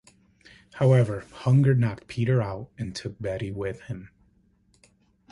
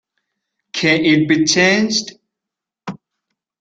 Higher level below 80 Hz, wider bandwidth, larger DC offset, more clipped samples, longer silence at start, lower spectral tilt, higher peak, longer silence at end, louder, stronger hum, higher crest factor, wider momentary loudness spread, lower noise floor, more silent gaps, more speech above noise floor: about the same, -54 dBFS vs -58 dBFS; first, 11 kHz vs 9 kHz; neither; neither; about the same, 0.75 s vs 0.75 s; first, -8 dB/octave vs -3.5 dB/octave; second, -8 dBFS vs 0 dBFS; first, 1.25 s vs 0.65 s; second, -25 LUFS vs -14 LUFS; neither; about the same, 18 dB vs 18 dB; second, 16 LU vs 21 LU; second, -63 dBFS vs -84 dBFS; neither; second, 39 dB vs 70 dB